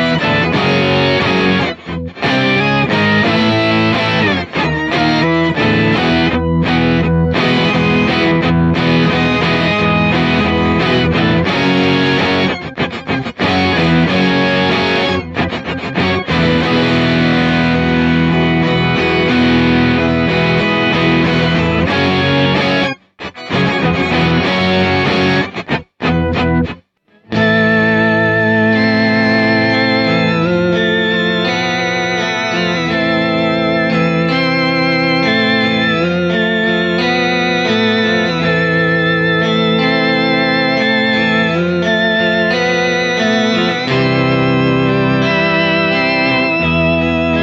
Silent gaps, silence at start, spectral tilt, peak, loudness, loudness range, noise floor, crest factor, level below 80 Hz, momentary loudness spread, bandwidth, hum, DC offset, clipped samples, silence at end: none; 0 s; -6 dB/octave; -4 dBFS; -13 LUFS; 2 LU; -50 dBFS; 10 dB; -36 dBFS; 4 LU; 7.8 kHz; none; under 0.1%; under 0.1%; 0 s